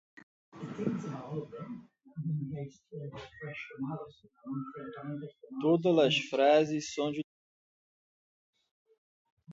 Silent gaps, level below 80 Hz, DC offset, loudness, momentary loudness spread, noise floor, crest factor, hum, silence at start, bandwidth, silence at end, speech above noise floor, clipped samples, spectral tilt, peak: 7.24-8.53 s, 8.71-8.85 s, 8.98-9.37 s; -74 dBFS; under 0.1%; -32 LUFS; 20 LU; under -90 dBFS; 22 dB; none; 0.55 s; 8 kHz; 0 s; over 58 dB; under 0.1%; -5.5 dB/octave; -12 dBFS